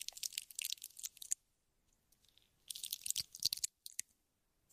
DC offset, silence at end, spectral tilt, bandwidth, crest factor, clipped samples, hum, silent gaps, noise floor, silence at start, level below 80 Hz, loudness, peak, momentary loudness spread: under 0.1%; 0.7 s; 3 dB/octave; 16 kHz; 32 dB; under 0.1%; none; none; -82 dBFS; 0 s; -80 dBFS; -42 LUFS; -14 dBFS; 10 LU